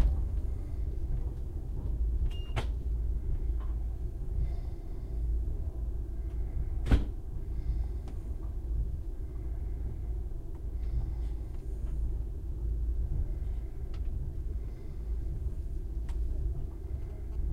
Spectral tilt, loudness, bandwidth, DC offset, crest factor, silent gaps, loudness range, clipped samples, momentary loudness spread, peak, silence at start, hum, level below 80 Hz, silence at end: -8 dB/octave; -37 LUFS; 4.7 kHz; under 0.1%; 20 dB; none; 3 LU; under 0.1%; 6 LU; -12 dBFS; 0 s; none; -34 dBFS; 0 s